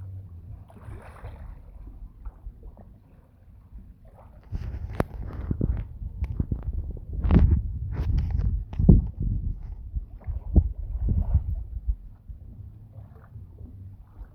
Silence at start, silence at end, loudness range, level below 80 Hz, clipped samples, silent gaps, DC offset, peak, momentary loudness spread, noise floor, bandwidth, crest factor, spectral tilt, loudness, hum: 0 s; 0.05 s; 21 LU; -30 dBFS; under 0.1%; none; under 0.1%; -2 dBFS; 24 LU; -53 dBFS; 4.1 kHz; 26 dB; -10.5 dB/octave; -28 LUFS; none